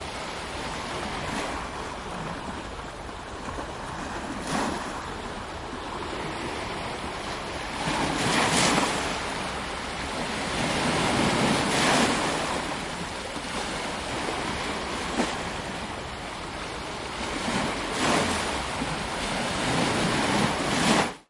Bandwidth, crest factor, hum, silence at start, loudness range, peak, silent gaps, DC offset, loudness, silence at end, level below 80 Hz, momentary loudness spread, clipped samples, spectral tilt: 11.5 kHz; 20 dB; none; 0 s; 8 LU; -8 dBFS; none; under 0.1%; -28 LUFS; 0.05 s; -46 dBFS; 12 LU; under 0.1%; -3.5 dB/octave